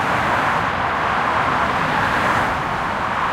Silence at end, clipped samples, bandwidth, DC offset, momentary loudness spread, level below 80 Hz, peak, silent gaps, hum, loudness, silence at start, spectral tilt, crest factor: 0 s; under 0.1%; 16.5 kHz; under 0.1%; 4 LU; -42 dBFS; -6 dBFS; none; none; -19 LUFS; 0 s; -5 dB/octave; 14 dB